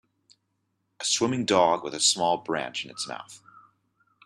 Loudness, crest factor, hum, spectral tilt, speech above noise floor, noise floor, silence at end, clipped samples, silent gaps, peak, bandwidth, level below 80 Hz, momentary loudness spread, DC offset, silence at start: -25 LUFS; 22 dB; none; -2.5 dB/octave; 50 dB; -76 dBFS; 0.9 s; under 0.1%; none; -6 dBFS; 14 kHz; -70 dBFS; 13 LU; under 0.1%; 1 s